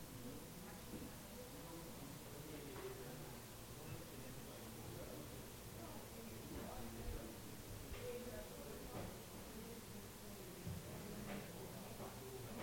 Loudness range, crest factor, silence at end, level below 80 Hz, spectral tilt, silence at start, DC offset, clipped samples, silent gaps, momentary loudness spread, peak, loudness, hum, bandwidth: 1 LU; 16 dB; 0 s; -62 dBFS; -4.5 dB/octave; 0 s; under 0.1%; under 0.1%; none; 3 LU; -36 dBFS; -52 LUFS; none; 17 kHz